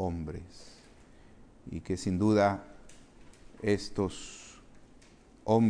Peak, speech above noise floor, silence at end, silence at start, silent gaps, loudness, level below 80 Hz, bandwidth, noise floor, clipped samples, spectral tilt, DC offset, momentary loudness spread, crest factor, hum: -12 dBFS; 26 dB; 0 s; 0 s; none; -32 LUFS; -54 dBFS; 10.5 kHz; -57 dBFS; under 0.1%; -6.5 dB/octave; under 0.1%; 25 LU; 20 dB; none